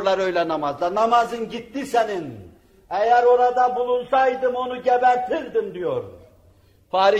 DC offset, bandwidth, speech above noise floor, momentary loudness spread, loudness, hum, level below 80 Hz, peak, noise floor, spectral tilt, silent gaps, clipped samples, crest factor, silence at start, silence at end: under 0.1%; 13 kHz; 34 dB; 13 LU; -21 LUFS; none; -58 dBFS; -6 dBFS; -55 dBFS; -4.5 dB/octave; none; under 0.1%; 16 dB; 0 s; 0 s